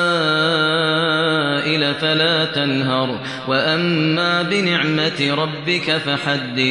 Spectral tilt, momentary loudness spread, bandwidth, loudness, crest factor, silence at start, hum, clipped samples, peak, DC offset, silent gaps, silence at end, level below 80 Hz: -5 dB/octave; 4 LU; 10.5 kHz; -17 LUFS; 14 dB; 0 s; none; under 0.1%; -4 dBFS; under 0.1%; none; 0 s; -66 dBFS